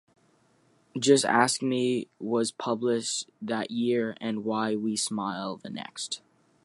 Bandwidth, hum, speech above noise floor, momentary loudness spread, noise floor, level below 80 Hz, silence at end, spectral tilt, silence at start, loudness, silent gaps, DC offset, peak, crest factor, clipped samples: 11.5 kHz; none; 38 dB; 13 LU; -65 dBFS; -76 dBFS; 0.45 s; -3.5 dB/octave; 0.95 s; -28 LUFS; none; under 0.1%; -6 dBFS; 22 dB; under 0.1%